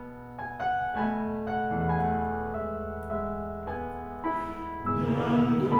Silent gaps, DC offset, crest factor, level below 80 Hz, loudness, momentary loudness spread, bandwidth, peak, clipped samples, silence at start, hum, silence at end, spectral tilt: none; under 0.1%; 16 dB; -48 dBFS; -30 LUFS; 10 LU; 6.6 kHz; -12 dBFS; under 0.1%; 0 s; none; 0 s; -9 dB/octave